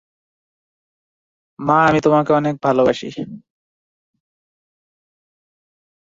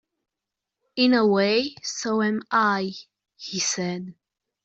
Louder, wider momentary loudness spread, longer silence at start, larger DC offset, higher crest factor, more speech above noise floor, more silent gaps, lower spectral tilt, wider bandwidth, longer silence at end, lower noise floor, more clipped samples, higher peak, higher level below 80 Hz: first, -16 LUFS vs -23 LUFS; about the same, 16 LU vs 16 LU; first, 1.6 s vs 0.95 s; neither; about the same, 20 dB vs 18 dB; first, over 74 dB vs 63 dB; neither; first, -7 dB/octave vs -3.5 dB/octave; about the same, 7.8 kHz vs 8.2 kHz; first, 2.65 s vs 0.5 s; first, under -90 dBFS vs -86 dBFS; neither; first, 0 dBFS vs -8 dBFS; first, -56 dBFS vs -70 dBFS